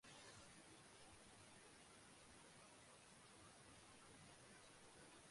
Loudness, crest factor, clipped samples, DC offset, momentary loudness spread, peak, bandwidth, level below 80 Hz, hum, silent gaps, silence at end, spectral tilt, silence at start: -64 LUFS; 16 dB; under 0.1%; under 0.1%; 2 LU; -50 dBFS; 11.5 kHz; -82 dBFS; none; none; 0 s; -2.5 dB/octave; 0.05 s